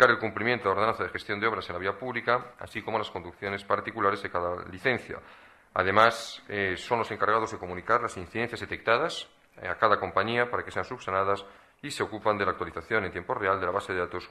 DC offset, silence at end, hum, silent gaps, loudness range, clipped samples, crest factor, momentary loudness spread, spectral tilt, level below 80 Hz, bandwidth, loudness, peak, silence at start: under 0.1%; 0 s; none; none; 3 LU; under 0.1%; 24 dB; 11 LU; -4.5 dB/octave; -60 dBFS; 13.5 kHz; -28 LUFS; -6 dBFS; 0 s